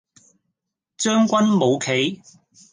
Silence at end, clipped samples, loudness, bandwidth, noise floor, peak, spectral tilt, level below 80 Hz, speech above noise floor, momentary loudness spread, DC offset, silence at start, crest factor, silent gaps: 0.55 s; under 0.1%; -19 LUFS; 10 kHz; -79 dBFS; -6 dBFS; -4.5 dB/octave; -70 dBFS; 60 dB; 8 LU; under 0.1%; 1 s; 16 dB; none